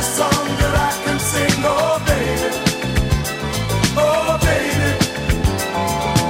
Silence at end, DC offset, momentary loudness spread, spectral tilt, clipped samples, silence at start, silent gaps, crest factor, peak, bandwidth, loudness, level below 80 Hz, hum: 0 s; under 0.1%; 4 LU; -4.5 dB/octave; under 0.1%; 0 s; none; 16 dB; -2 dBFS; 16.5 kHz; -18 LUFS; -28 dBFS; none